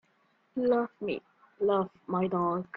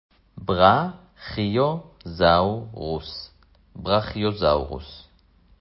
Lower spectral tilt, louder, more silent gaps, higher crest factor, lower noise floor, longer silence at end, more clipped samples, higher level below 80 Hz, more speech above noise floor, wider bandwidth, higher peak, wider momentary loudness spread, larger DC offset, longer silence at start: about the same, -10 dB/octave vs -10.5 dB/octave; second, -31 LUFS vs -22 LUFS; neither; second, 16 dB vs 22 dB; first, -70 dBFS vs -57 dBFS; second, 0 s vs 0.6 s; neither; second, -70 dBFS vs -42 dBFS; first, 40 dB vs 35 dB; second, 4.8 kHz vs 5.8 kHz; second, -14 dBFS vs -2 dBFS; second, 8 LU vs 19 LU; neither; first, 0.55 s vs 0.35 s